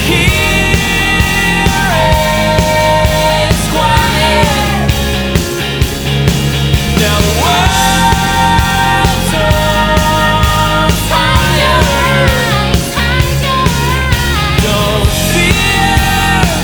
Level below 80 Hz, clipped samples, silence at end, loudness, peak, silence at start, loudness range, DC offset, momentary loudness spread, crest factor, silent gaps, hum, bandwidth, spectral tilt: -18 dBFS; under 0.1%; 0 s; -10 LUFS; 0 dBFS; 0 s; 2 LU; under 0.1%; 3 LU; 10 dB; none; none; over 20 kHz; -4 dB/octave